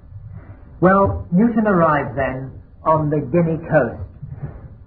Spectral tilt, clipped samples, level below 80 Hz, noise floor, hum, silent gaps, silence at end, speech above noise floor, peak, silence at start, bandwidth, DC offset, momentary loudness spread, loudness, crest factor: -13.5 dB/octave; under 0.1%; -40 dBFS; -38 dBFS; none; none; 0.1 s; 21 dB; -2 dBFS; 0.15 s; 3.6 kHz; under 0.1%; 19 LU; -18 LUFS; 16 dB